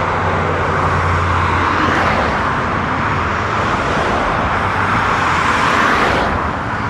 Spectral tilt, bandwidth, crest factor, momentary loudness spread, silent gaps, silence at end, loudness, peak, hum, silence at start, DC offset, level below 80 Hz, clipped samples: -5.5 dB/octave; 12 kHz; 14 dB; 4 LU; none; 0 s; -15 LUFS; -2 dBFS; none; 0 s; under 0.1%; -30 dBFS; under 0.1%